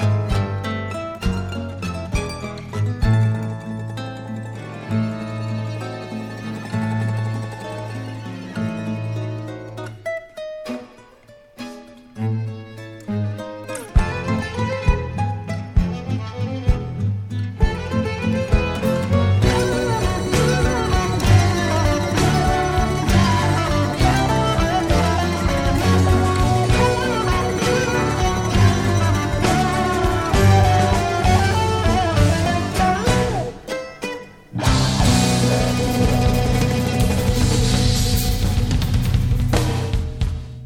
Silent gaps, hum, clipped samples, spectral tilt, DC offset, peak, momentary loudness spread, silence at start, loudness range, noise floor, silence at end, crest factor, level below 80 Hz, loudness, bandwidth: none; none; under 0.1%; -5.5 dB/octave; under 0.1%; -2 dBFS; 13 LU; 0 s; 10 LU; -47 dBFS; 0 s; 16 dB; -28 dBFS; -20 LUFS; 16.5 kHz